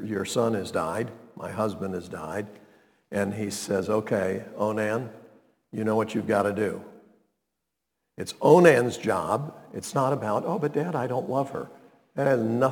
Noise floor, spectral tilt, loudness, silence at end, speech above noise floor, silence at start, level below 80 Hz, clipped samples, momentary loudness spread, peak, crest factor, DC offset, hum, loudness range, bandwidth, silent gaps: -83 dBFS; -6 dB/octave; -26 LUFS; 0 s; 57 dB; 0 s; -68 dBFS; under 0.1%; 14 LU; -2 dBFS; 24 dB; under 0.1%; none; 7 LU; 19 kHz; none